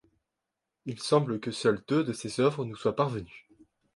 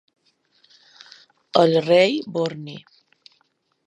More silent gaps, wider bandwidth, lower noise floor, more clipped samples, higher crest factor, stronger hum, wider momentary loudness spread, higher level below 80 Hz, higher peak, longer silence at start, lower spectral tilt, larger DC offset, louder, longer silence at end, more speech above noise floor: neither; about the same, 11.5 kHz vs 10.5 kHz; first, -86 dBFS vs -68 dBFS; neither; about the same, 20 dB vs 22 dB; neither; second, 13 LU vs 21 LU; first, -64 dBFS vs -72 dBFS; second, -10 dBFS vs 0 dBFS; second, 0.85 s vs 1.55 s; about the same, -6 dB/octave vs -6 dB/octave; neither; second, -29 LUFS vs -19 LUFS; second, 0.55 s vs 1.1 s; first, 58 dB vs 49 dB